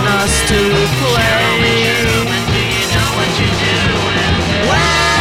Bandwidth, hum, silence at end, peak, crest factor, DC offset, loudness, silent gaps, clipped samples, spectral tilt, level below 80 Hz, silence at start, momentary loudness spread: 16.5 kHz; none; 0 s; -2 dBFS; 12 dB; 0.6%; -12 LUFS; none; under 0.1%; -4 dB/octave; -26 dBFS; 0 s; 3 LU